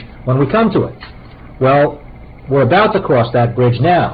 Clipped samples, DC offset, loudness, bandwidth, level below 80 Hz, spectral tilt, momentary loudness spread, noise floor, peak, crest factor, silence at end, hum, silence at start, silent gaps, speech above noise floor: under 0.1%; 0.2%; -13 LUFS; 5 kHz; -38 dBFS; -11 dB/octave; 7 LU; -35 dBFS; -2 dBFS; 12 dB; 0 s; none; 0 s; none; 22 dB